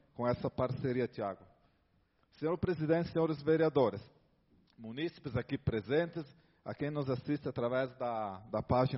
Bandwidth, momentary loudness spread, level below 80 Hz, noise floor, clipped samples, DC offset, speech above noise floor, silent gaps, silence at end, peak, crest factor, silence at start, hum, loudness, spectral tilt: 5.8 kHz; 13 LU; -60 dBFS; -73 dBFS; under 0.1%; under 0.1%; 39 dB; none; 0 s; -16 dBFS; 18 dB; 0.2 s; none; -35 LUFS; -6.5 dB/octave